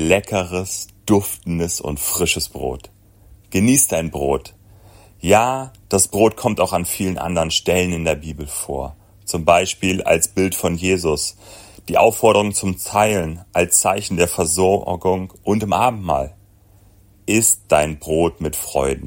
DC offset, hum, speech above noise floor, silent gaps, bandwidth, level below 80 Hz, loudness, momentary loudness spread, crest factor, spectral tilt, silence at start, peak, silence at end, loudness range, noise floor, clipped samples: under 0.1%; none; 32 dB; none; 16.5 kHz; -42 dBFS; -18 LUFS; 11 LU; 18 dB; -4 dB/octave; 0 s; 0 dBFS; 0 s; 3 LU; -50 dBFS; under 0.1%